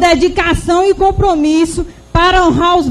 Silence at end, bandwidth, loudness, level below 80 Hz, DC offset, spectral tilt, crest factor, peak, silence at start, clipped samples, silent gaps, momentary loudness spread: 0 s; 13 kHz; -11 LUFS; -24 dBFS; under 0.1%; -5 dB/octave; 10 dB; 0 dBFS; 0 s; under 0.1%; none; 6 LU